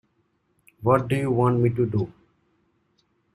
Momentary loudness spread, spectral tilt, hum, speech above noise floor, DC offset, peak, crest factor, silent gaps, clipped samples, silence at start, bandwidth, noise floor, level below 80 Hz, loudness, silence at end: 8 LU; -9 dB/octave; none; 48 dB; under 0.1%; -6 dBFS; 20 dB; none; under 0.1%; 0.8 s; 13 kHz; -69 dBFS; -56 dBFS; -23 LUFS; 1.25 s